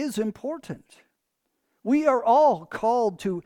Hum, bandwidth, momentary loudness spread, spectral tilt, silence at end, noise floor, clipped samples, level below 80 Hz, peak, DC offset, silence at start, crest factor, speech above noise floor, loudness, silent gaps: none; 18.5 kHz; 17 LU; -6 dB/octave; 0.05 s; -78 dBFS; under 0.1%; -64 dBFS; -8 dBFS; under 0.1%; 0 s; 16 dB; 55 dB; -23 LUFS; none